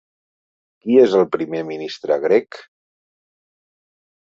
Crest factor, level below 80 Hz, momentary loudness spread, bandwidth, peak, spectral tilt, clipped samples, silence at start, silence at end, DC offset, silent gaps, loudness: 20 dB; -66 dBFS; 15 LU; 7.4 kHz; -2 dBFS; -6.5 dB/octave; under 0.1%; 0.85 s; 1.7 s; under 0.1%; none; -18 LUFS